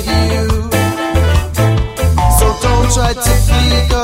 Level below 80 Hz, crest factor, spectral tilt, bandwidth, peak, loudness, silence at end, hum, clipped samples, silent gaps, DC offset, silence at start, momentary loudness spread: -16 dBFS; 12 dB; -5 dB/octave; 16.5 kHz; 0 dBFS; -13 LUFS; 0 s; none; under 0.1%; none; under 0.1%; 0 s; 3 LU